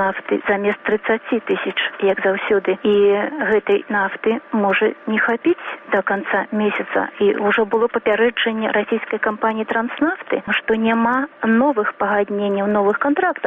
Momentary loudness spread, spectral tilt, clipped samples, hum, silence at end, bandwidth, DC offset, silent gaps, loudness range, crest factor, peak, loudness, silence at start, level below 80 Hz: 4 LU; -8 dB/octave; under 0.1%; none; 0 s; 3.9 kHz; under 0.1%; none; 1 LU; 12 dB; -6 dBFS; -19 LUFS; 0 s; -60 dBFS